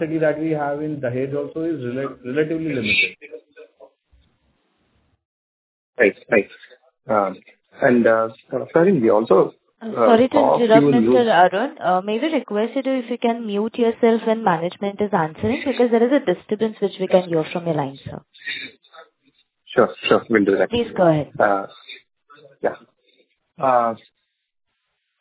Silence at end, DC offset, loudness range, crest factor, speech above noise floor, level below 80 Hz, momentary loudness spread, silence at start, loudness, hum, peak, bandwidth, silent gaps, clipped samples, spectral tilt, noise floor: 1.25 s; under 0.1%; 9 LU; 20 dB; 55 dB; -56 dBFS; 13 LU; 0 s; -19 LUFS; none; 0 dBFS; 4 kHz; 5.25-5.93 s; under 0.1%; -10 dB/octave; -74 dBFS